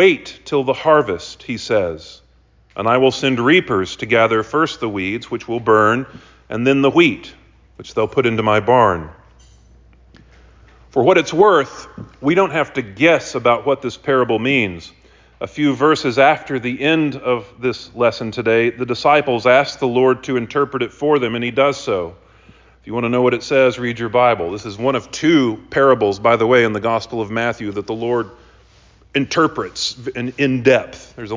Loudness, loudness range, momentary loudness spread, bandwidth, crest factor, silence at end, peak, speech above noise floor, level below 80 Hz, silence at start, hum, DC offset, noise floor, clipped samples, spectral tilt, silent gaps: -17 LUFS; 3 LU; 11 LU; 7.6 kHz; 16 dB; 0 s; -2 dBFS; 36 dB; -48 dBFS; 0 s; none; under 0.1%; -53 dBFS; under 0.1%; -5.5 dB/octave; none